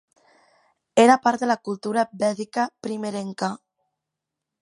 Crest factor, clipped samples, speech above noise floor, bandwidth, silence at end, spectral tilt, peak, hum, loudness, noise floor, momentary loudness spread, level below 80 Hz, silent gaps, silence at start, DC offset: 20 dB; under 0.1%; 62 dB; 11.5 kHz; 1.05 s; -4.5 dB/octave; -4 dBFS; none; -23 LUFS; -84 dBFS; 13 LU; -74 dBFS; none; 0.95 s; under 0.1%